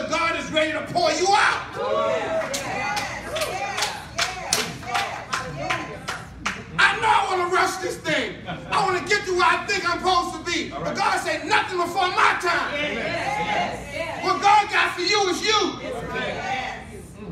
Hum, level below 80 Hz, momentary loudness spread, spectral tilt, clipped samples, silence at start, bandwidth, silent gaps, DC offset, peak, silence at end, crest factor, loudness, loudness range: none; -50 dBFS; 10 LU; -2.5 dB/octave; under 0.1%; 0 s; 16 kHz; none; under 0.1%; 0 dBFS; 0 s; 24 dB; -22 LUFS; 4 LU